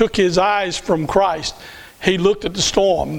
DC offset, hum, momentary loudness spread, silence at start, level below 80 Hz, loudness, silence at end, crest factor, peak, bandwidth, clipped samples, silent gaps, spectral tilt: under 0.1%; none; 10 LU; 0 s; -40 dBFS; -17 LUFS; 0 s; 18 dB; 0 dBFS; 18.5 kHz; under 0.1%; none; -4 dB/octave